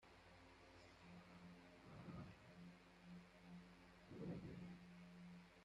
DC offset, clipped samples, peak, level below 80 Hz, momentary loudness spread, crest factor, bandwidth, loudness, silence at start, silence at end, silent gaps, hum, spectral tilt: under 0.1%; under 0.1%; -42 dBFS; -76 dBFS; 11 LU; 18 dB; 11.5 kHz; -61 LUFS; 0 s; 0 s; none; none; -6.5 dB/octave